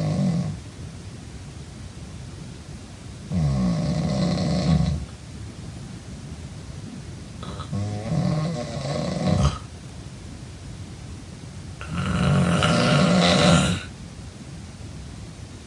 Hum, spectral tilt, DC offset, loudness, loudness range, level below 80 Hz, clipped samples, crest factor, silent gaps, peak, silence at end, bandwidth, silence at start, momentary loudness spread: none; -5.5 dB/octave; under 0.1%; -22 LUFS; 10 LU; -40 dBFS; under 0.1%; 20 dB; none; -4 dBFS; 0 s; 11.5 kHz; 0 s; 20 LU